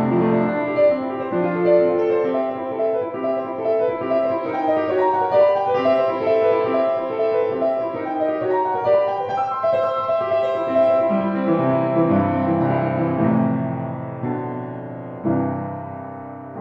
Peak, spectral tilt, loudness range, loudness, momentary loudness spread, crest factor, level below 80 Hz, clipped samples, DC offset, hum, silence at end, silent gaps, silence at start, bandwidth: -4 dBFS; -9.5 dB/octave; 3 LU; -20 LUFS; 10 LU; 16 dB; -64 dBFS; under 0.1%; under 0.1%; none; 0 s; none; 0 s; 6 kHz